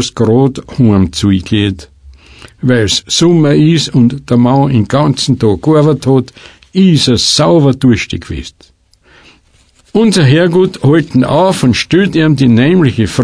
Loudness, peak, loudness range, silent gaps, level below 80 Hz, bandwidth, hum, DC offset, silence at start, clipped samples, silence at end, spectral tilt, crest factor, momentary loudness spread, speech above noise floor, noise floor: -10 LUFS; 0 dBFS; 3 LU; none; -36 dBFS; 11 kHz; none; under 0.1%; 0 s; under 0.1%; 0 s; -6 dB/octave; 10 dB; 7 LU; 39 dB; -48 dBFS